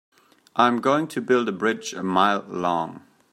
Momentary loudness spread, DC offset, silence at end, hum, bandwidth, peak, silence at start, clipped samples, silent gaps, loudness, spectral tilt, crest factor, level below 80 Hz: 8 LU; under 0.1%; 0.35 s; none; 14.5 kHz; -4 dBFS; 0.55 s; under 0.1%; none; -23 LUFS; -5 dB/octave; 20 dB; -70 dBFS